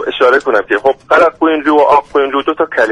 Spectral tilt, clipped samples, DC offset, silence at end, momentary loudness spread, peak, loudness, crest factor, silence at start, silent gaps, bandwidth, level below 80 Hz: -4.5 dB/octave; under 0.1%; under 0.1%; 0 s; 5 LU; 0 dBFS; -11 LUFS; 10 dB; 0 s; none; 10.5 kHz; -48 dBFS